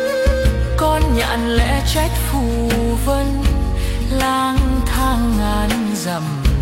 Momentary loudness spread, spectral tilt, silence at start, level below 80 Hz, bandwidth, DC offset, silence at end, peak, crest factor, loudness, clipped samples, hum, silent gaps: 4 LU; -5.5 dB/octave; 0 s; -20 dBFS; 16.5 kHz; under 0.1%; 0 s; -4 dBFS; 12 dB; -18 LUFS; under 0.1%; none; none